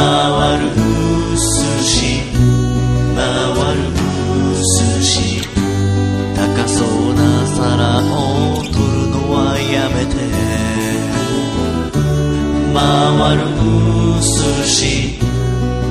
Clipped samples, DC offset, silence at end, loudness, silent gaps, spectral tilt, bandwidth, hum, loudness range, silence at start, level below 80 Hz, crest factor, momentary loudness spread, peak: under 0.1%; 0.3%; 0 s; -14 LUFS; none; -5 dB/octave; 14 kHz; none; 3 LU; 0 s; -24 dBFS; 14 dB; 5 LU; 0 dBFS